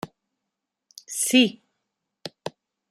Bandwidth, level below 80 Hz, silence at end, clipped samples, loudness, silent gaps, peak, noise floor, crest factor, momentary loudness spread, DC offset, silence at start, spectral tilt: 15 kHz; -74 dBFS; 0.4 s; under 0.1%; -21 LUFS; none; -6 dBFS; -84 dBFS; 22 dB; 22 LU; under 0.1%; 0.05 s; -2 dB/octave